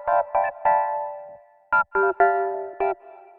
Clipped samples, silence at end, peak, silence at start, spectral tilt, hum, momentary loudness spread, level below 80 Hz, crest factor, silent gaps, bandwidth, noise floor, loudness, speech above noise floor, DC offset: under 0.1%; 0.25 s; -6 dBFS; 0 s; -9 dB/octave; none; 12 LU; -60 dBFS; 18 dB; none; 4.1 kHz; -45 dBFS; -23 LUFS; 25 dB; under 0.1%